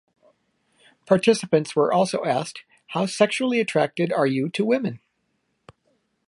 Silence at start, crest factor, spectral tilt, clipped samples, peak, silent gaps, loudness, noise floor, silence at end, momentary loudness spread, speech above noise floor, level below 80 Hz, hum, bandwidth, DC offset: 1.1 s; 20 dB; -5.5 dB/octave; under 0.1%; -4 dBFS; none; -22 LUFS; -72 dBFS; 1.3 s; 11 LU; 51 dB; -70 dBFS; none; 11.5 kHz; under 0.1%